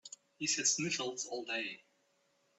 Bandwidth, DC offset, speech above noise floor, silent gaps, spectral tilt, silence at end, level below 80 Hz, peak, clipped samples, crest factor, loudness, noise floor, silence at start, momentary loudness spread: 8.6 kHz; under 0.1%; 38 dB; none; -1.5 dB/octave; 0.8 s; -82 dBFS; -18 dBFS; under 0.1%; 22 dB; -35 LUFS; -75 dBFS; 0.05 s; 15 LU